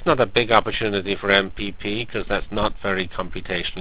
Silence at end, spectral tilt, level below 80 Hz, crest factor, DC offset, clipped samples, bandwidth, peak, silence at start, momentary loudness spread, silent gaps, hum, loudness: 0 s; -8.5 dB/octave; -38 dBFS; 22 dB; 2%; under 0.1%; 4 kHz; 0 dBFS; 0 s; 10 LU; none; none; -22 LUFS